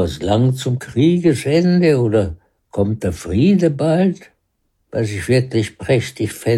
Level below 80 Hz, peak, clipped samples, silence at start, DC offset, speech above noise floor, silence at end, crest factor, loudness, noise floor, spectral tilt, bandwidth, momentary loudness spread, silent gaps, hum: -44 dBFS; -4 dBFS; under 0.1%; 0 s; under 0.1%; 51 dB; 0 s; 12 dB; -17 LUFS; -67 dBFS; -7 dB/octave; 13 kHz; 9 LU; none; none